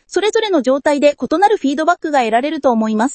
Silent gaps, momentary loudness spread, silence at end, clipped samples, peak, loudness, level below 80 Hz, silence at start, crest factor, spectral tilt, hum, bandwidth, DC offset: none; 2 LU; 0 s; under 0.1%; 0 dBFS; -15 LUFS; -56 dBFS; 0.1 s; 14 dB; -4 dB/octave; none; 8.8 kHz; under 0.1%